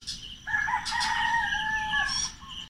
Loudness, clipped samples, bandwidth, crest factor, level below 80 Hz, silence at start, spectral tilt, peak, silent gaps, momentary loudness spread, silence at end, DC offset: -27 LUFS; under 0.1%; 16 kHz; 14 dB; -50 dBFS; 0 s; 0 dB/octave; -14 dBFS; none; 7 LU; 0 s; 0.2%